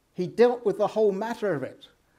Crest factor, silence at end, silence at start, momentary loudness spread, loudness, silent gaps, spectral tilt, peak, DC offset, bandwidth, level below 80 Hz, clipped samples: 18 dB; 0.45 s; 0.2 s; 11 LU; -25 LUFS; none; -6.5 dB/octave; -8 dBFS; under 0.1%; 12.5 kHz; -72 dBFS; under 0.1%